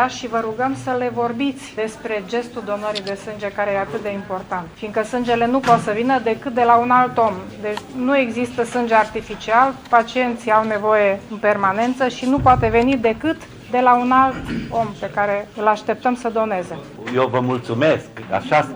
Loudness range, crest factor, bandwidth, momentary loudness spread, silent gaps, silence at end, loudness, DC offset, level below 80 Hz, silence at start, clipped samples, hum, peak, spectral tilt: 6 LU; 18 dB; over 20 kHz; 11 LU; none; 0 s; -19 LUFS; under 0.1%; -46 dBFS; 0 s; under 0.1%; none; 0 dBFS; -6 dB/octave